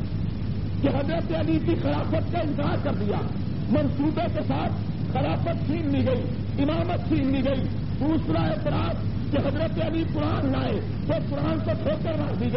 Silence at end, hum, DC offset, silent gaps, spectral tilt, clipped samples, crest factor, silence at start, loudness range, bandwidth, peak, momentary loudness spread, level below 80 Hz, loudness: 0 s; none; 2%; none; -7 dB/octave; under 0.1%; 14 dB; 0 s; 1 LU; 5.8 kHz; -10 dBFS; 4 LU; -38 dBFS; -26 LUFS